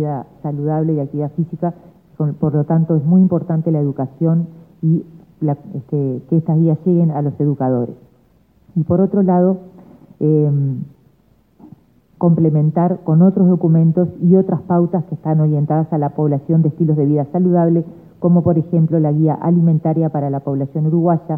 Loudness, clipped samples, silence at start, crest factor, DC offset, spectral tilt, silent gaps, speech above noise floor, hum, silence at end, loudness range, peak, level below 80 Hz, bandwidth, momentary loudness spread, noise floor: -16 LUFS; under 0.1%; 0 s; 14 dB; under 0.1%; -14 dB/octave; none; 40 dB; none; 0 s; 4 LU; -2 dBFS; -56 dBFS; 2.1 kHz; 9 LU; -55 dBFS